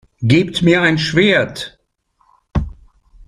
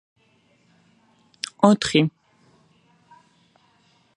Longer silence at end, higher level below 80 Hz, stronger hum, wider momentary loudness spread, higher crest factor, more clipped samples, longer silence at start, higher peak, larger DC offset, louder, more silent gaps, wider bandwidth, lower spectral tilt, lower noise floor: second, 0.05 s vs 2.1 s; first, -36 dBFS vs -60 dBFS; neither; about the same, 16 LU vs 17 LU; second, 16 dB vs 26 dB; neither; second, 0.2 s vs 1.6 s; about the same, 0 dBFS vs 0 dBFS; neither; first, -15 LUFS vs -20 LUFS; neither; about the same, 12.5 kHz vs 11.5 kHz; about the same, -6 dB/octave vs -5.5 dB/octave; about the same, -62 dBFS vs -62 dBFS